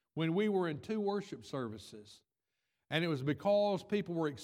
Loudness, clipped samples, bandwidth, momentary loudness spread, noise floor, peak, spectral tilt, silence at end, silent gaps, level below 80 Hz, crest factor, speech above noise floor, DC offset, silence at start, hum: -35 LUFS; under 0.1%; 14.5 kHz; 12 LU; -88 dBFS; -16 dBFS; -6.5 dB/octave; 0 s; none; -78 dBFS; 20 dB; 53 dB; under 0.1%; 0.15 s; none